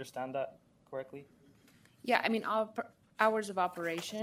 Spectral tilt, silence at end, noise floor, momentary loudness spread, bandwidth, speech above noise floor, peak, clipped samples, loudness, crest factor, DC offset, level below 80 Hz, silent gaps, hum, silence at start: -4 dB/octave; 0 s; -64 dBFS; 15 LU; 16 kHz; 29 dB; -12 dBFS; under 0.1%; -34 LUFS; 24 dB; under 0.1%; -80 dBFS; none; none; 0 s